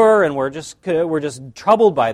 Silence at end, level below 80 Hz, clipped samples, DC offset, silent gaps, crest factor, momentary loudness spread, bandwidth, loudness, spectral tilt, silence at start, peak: 0 s; -56 dBFS; under 0.1%; under 0.1%; none; 16 dB; 12 LU; 12 kHz; -17 LUFS; -5.5 dB/octave; 0 s; 0 dBFS